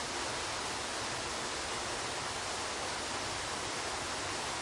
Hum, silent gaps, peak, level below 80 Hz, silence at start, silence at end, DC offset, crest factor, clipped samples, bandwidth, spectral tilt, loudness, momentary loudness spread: none; none; -24 dBFS; -58 dBFS; 0 s; 0 s; under 0.1%; 14 dB; under 0.1%; 11.5 kHz; -1.5 dB/octave; -36 LUFS; 0 LU